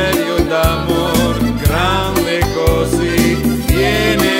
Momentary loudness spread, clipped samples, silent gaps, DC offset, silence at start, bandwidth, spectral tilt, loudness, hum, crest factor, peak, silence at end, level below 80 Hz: 3 LU; under 0.1%; none; under 0.1%; 0 s; 16.5 kHz; -5 dB/octave; -14 LUFS; none; 14 dB; 0 dBFS; 0 s; -22 dBFS